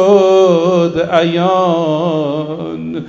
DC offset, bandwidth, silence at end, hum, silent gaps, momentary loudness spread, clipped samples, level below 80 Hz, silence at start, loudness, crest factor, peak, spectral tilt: under 0.1%; 7.8 kHz; 0 s; none; none; 12 LU; under 0.1%; -50 dBFS; 0 s; -13 LUFS; 12 dB; 0 dBFS; -6.5 dB/octave